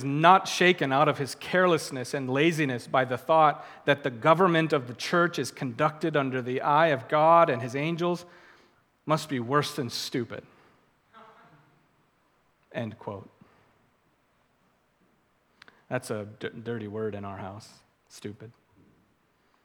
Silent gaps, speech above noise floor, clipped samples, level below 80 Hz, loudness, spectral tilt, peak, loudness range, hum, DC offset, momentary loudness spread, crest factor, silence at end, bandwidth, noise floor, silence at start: none; 42 dB; under 0.1%; -76 dBFS; -26 LUFS; -5 dB/octave; -4 dBFS; 19 LU; none; under 0.1%; 18 LU; 24 dB; 1.15 s; 18 kHz; -68 dBFS; 0 s